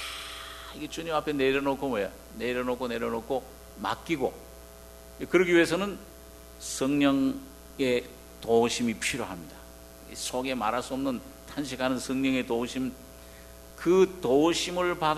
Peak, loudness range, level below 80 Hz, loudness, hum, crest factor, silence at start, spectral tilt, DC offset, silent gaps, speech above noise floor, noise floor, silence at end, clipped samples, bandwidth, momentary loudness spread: -8 dBFS; 5 LU; -52 dBFS; -28 LUFS; none; 20 dB; 0 s; -4.5 dB/octave; under 0.1%; none; 20 dB; -48 dBFS; 0 s; under 0.1%; 14 kHz; 24 LU